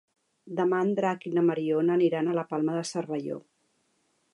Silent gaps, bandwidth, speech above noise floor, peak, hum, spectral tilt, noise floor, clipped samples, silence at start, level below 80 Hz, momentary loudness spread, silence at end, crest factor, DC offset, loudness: none; 11 kHz; 45 dB; -14 dBFS; none; -6.5 dB/octave; -72 dBFS; under 0.1%; 0.45 s; -82 dBFS; 9 LU; 0.95 s; 16 dB; under 0.1%; -27 LUFS